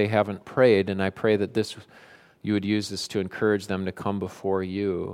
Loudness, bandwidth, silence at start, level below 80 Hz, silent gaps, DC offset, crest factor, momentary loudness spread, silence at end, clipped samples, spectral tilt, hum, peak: -26 LUFS; 15 kHz; 0 s; -64 dBFS; none; under 0.1%; 20 dB; 10 LU; 0 s; under 0.1%; -6 dB/octave; none; -6 dBFS